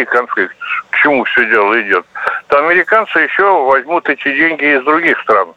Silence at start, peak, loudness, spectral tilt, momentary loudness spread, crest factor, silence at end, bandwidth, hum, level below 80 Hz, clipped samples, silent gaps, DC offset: 0 s; 0 dBFS; -11 LUFS; -5.5 dB/octave; 7 LU; 12 dB; 0.05 s; 9.4 kHz; none; -58 dBFS; under 0.1%; none; under 0.1%